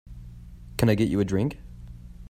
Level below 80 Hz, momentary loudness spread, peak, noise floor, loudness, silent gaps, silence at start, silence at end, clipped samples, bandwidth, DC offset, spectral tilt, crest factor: -44 dBFS; 23 LU; -6 dBFS; -43 dBFS; -25 LUFS; none; 0.05 s; 0.05 s; under 0.1%; 16 kHz; under 0.1%; -7 dB/octave; 20 dB